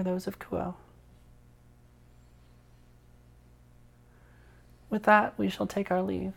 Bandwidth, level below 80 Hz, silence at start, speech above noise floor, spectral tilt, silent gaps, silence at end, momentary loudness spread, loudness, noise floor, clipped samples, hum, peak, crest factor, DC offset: 17 kHz; -58 dBFS; 0 s; 29 dB; -6.5 dB/octave; none; 0.05 s; 13 LU; -29 LUFS; -57 dBFS; under 0.1%; 60 Hz at -60 dBFS; -8 dBFS; 26 dB; under 0.1%